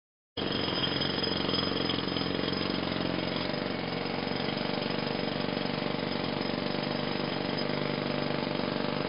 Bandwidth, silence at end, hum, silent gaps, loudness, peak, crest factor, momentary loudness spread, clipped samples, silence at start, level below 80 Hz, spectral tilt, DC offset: 5.6 kHz; 0 s; none; none; -31 LUFS; -16 dBFS; 16 dB; 3 LU; under 0.1%; 0.35 s; -58 dBFS; -3 dB/octave; 0.2%